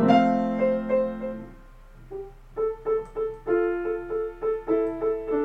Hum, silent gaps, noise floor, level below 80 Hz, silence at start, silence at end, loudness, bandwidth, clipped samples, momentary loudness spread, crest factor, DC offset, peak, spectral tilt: none; none; -47 dBFS; -48 dBFS; 0 s; 0 s; -26 LUFS; 7.8 kHz; under 0.1%; 16 LU; 20 dB; under 0.1%; -6 dBFS; -8 dB/octave